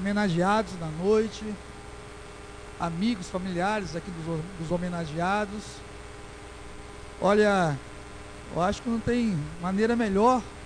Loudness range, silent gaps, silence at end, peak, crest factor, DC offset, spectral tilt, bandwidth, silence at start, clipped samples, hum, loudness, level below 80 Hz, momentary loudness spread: 6 LU; none; 0 s; -10 dBFS; 18 dB; under 0.1%; -6 dB/octave; 10.5 kHz; 0 s; under 0.1%; none; -27 LUFS; -48 dBFS; 20 LU